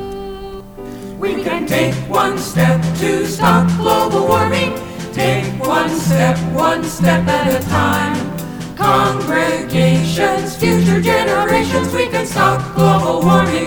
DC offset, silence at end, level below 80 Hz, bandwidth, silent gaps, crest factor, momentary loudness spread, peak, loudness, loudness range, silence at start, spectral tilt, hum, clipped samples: under 0.1%; 0 s; -38 dBFS; over 20 kHz; none; 14 dB; 11 LU; 0 dBFS; -15 LUFS; 1 LU; 0 s; -5.5 dB/octave; none; under 0.1%